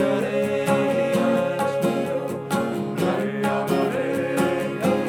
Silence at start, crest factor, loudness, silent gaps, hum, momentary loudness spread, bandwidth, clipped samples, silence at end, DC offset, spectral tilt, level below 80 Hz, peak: 0 s; 16 dB; -23 LUFS; none; none; 4 LU; 17.5 kHz; under 0.1%; 0 s; under 0.1%; -6 dB/octave; -64 dBFS; -8 dBFS